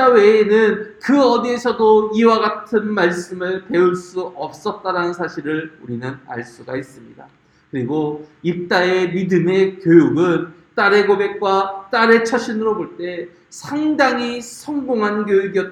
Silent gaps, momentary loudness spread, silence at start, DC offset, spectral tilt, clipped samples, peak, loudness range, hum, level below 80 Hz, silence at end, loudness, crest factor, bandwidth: none; 15 LU; 0 s; under 0.1%; -6 dB/octave; under 0.1%; 0 dBFS; 10 LU; none; -60 dBFS; 0 s; -17 LUFS; 16 dB; 12 kHz